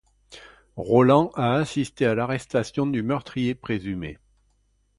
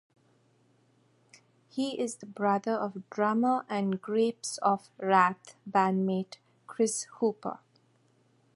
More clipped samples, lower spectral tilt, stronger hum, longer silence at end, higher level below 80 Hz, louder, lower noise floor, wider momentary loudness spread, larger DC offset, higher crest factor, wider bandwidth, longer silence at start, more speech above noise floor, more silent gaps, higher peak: neither; first, -7 dB/octave vs -5 dB/octave; neither; second, 0.85 s vs 1 s; first, -54 dBFS vs -80 dBFS; first, -23 LUFS vs -30 LUFS; about the same, -66 dBFS vs -67 dBFS; about the same, 14 LU vs 14 LU; neither; about the same, 20 dB vs 22 dB; about the same, 11.5 kHz vs 11.5 kHz; second, 0.3 s vs 1.75 s; first, 43 dB vs 38 dB; neither; first, -4 dBFS vs -8 dBFS